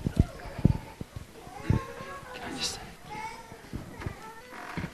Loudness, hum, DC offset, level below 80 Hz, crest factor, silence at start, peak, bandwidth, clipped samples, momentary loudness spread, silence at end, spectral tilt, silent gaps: -34 LUFS; none; under 0.1%; -42 dBFS; 26 dB; 0 s; -6 dBFS; 13 kHz; under 0.1%; 15 LU; 0 s; -5.5 dB/octave; none